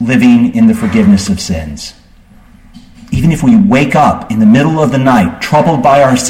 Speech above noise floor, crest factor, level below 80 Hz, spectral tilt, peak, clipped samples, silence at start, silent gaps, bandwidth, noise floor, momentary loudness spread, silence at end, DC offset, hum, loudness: 32 dB; 10 dB; -32 dBFS; -6 dB/octave; 0 dBFS; under 0.1%; 0 s; none; 15 kHz; -40 dBFS; 11 LU; 0 s; under 0.1%; none; -9 LUFS